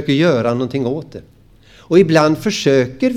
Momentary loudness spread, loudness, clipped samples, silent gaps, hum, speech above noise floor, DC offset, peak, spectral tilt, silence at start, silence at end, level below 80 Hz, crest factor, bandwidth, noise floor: 10 LU; -15 LUFS; under 0.1%; none; none; 31 dB; under 0.1%; 0 dBFS; -6 dB/octave; 0 s; 0 s; -52 dBFS; 16 dB; 15 kHz; -46 dBFS